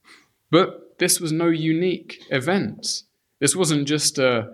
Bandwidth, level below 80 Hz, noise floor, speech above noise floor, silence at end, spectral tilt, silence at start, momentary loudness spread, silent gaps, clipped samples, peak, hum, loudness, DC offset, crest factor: 15 kHz; -68 dBFS; -54 dBFS; 33 dB; 0 s; -3.5 dB/octave; 0.5 s; 8 LU; none; under 0.1%; -4 dBFS; none; -21 LUFS; under 0.1%; 18 dB